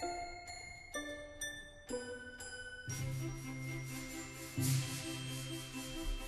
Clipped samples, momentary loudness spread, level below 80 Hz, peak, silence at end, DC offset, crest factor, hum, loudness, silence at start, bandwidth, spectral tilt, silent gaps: under 0.1%; 10 LU; -52 dBFS; -24 dBFS; 0 s; under 0.1%; 20 dB; none; -43 LUFS; 0 s; 13 kHz; -4 dB/octave; none